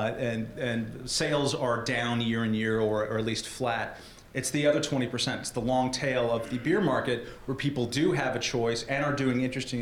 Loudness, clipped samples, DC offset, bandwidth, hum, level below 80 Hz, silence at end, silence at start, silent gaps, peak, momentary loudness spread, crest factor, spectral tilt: -29 LUFS; under 0.1%; under 0.1%; 17 kHz; none; -54 dBFS; 0 s; 0 s; none; -12 dBFS; 6 LU; 16 dB; -4.5 dB/octave